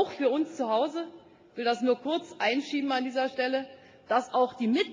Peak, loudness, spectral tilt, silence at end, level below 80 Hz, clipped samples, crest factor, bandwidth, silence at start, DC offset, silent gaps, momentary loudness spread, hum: -12 dBFS; -29 LUFS; -4.5 dB/octave; 0 s; -76 dBFS; under 0.1%; 18 dB; 9.6 kHz; 0 s; under 0.1%; none; 6 LU; none